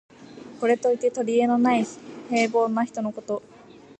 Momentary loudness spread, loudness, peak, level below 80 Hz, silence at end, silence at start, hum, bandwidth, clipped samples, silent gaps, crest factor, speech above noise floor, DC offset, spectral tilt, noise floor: 12 LU; -24 LUFS; -8 dBFS; -72 dBFS; 0.6 s; 0.2 s; none; 9 kHz; under 0.1%; none; 16 dB; 26 dB; under 0.1%; -5 dB/octave; -48 dBFS